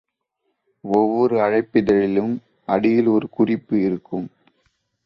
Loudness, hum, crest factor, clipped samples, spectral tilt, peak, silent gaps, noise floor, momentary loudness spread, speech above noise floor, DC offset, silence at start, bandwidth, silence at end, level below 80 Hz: -20 LUFS; none; 18 dB; under 0.1%; -9 dB/octave; -4 dBFS; none; -74 dBFS; 12 LU; 55 dB; under 0.1%; 0.85 s; 6.8 kHz; 0.8 s; -56 dBFS